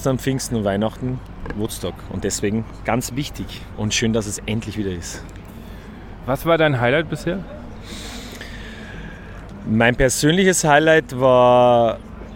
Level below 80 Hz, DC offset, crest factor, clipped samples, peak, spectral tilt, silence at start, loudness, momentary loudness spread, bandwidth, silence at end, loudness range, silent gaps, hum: -38 dBFS; under 0.1%; 20 dB; under 0.1%; 0 dBFS; -4.5 dB/octave; 0 s; -19 LUFS; 21 LU; 18 kHz; 0 s; 9 LU; none; none